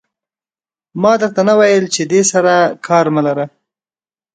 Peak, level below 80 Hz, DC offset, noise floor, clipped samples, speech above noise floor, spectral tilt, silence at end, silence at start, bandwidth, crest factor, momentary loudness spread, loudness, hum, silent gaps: 0 dBFS; -62 dBFS; under 0.1%; under -90 dBFS; under 0.1%; over 78 dB; -4.5 dB/octave; 0.85 s; 0.95 s; 9.4 kHz; 14 dB; 8 LU; -13 LUFS; none; none